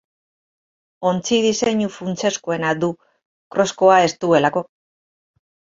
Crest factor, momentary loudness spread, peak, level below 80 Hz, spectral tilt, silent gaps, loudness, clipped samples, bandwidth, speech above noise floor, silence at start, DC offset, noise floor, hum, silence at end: 18 dB; 11 LU; -2 dBFS; -60 dBFS; -4.5 dB/octave; 3.25-3.51 s; -19 LUFS; under 0.1%; 7.8 kHz; over 72 dB; 1 s; under 0.1%; under -90 dBFS; none; 1.15 s